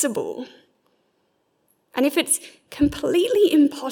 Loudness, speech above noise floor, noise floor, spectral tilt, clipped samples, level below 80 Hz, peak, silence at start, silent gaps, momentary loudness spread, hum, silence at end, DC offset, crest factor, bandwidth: -21 LUFS; 48 dB; -68 dBFS; -3.5 dB/octave; under 0.1%; -50 dBFS; -8 dBFS; 0 s; none; 17 LU; none; 0 s; under 0.1%; 16 dB; 18 kHz